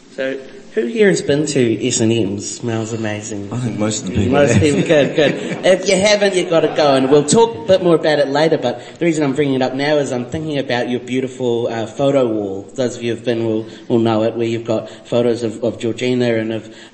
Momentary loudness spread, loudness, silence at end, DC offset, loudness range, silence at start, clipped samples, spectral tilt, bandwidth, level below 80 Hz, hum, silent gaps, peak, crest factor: 10 LU; -16 LUFS; 0.05 s; 0.1%; 5 LU; 0.1 s; under 0.1%; -5 dB/octave; 8.8 kHz; -50 dBFS; none; none; 0 dBFS; 16 dB